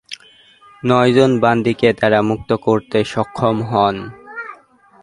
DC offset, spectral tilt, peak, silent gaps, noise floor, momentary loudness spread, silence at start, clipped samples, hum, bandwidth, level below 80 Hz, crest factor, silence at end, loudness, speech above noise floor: under 0.1%; -6.5 dB/octave; 0 dBFS; none; -47 dBFS; 18 LU; 0.1 s; under 0.1%; none; 11.5 kHz; -50 dBFS; 16 dB; 0.5 s; -16 LUFS; 32 dB